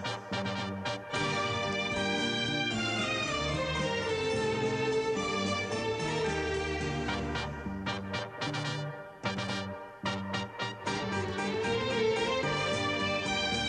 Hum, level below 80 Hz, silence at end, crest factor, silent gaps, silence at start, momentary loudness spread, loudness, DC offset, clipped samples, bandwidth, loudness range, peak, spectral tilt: none; -52 dBFS; 0 s; 16 dB; none; 0 s; 6 LU; -32 LUFS; under 0.1%; under 0.1%; 11 kHz; 5 LU; -18 dBFS; -4.5 dB/octave